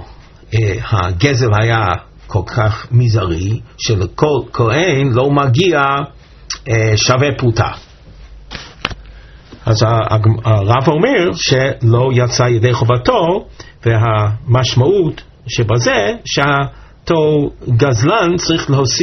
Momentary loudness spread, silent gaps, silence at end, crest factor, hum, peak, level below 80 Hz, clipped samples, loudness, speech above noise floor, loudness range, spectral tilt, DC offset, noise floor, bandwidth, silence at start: 10 LU; none; 0 s; 14 dB; none; 0 dBFS; -36 dBFS; under 0.1%; -14 LUFS; 24 dB; 4 LU; -5 dB/octave; under 0.1%; -37 dBFS; 6.6 kHz; 0 s